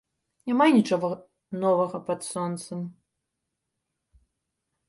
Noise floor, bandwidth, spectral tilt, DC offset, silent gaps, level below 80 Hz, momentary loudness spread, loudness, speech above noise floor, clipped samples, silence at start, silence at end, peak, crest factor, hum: -82 dBFS; 11.5 kHz; -6 dB/octave; under 0.1%; none; -70 dBFS; 19 LU; -25 LUFS; 58 dB; under 0.1%; 0.45 s; 1.95 s; -8 dBFS; 20 dB; none